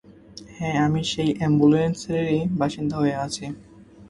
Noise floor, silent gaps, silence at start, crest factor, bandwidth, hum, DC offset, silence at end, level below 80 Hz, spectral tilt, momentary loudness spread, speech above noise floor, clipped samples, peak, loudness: -45 dBFS; none; 0.1 s; 18 dB; 11.5 kHz; none; under 0.1%; 0 s; -52 dBFS; -6 dB/octave; 16 LU; 23 dB; under 0.1%; -6 dBFS; -23 LUFS